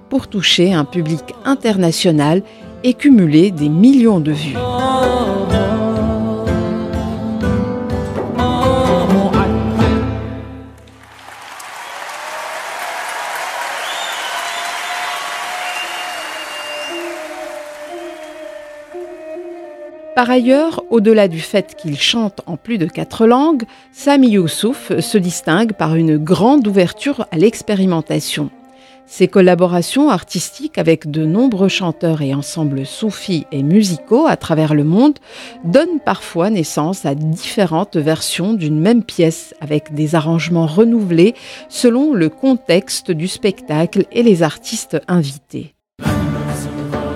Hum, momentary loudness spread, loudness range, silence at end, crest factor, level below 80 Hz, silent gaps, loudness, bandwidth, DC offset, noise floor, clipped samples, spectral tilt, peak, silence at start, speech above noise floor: none; 16 LU; 9 LU; 0 s; 16 dB; -38 dBFS; none; -15 LUFS; 15.5 kHz; under 0.1%; -43 dBFS; under 0.1%; -5.5 dB/octave; 0 dBFS; 0.1 s; 29 dB